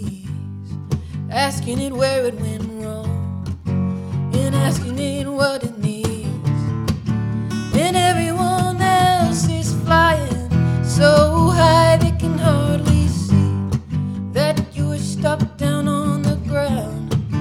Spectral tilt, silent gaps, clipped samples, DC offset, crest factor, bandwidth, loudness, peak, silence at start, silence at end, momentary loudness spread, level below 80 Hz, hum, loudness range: -6 dB/octave; none; under 0.1%; under 0.1%; 18 dB; 17.5 kHz; -18 LUFS; 0 dBFS; 0 s; 0 s; 11 LU; -34 dBFS; none; 7 LU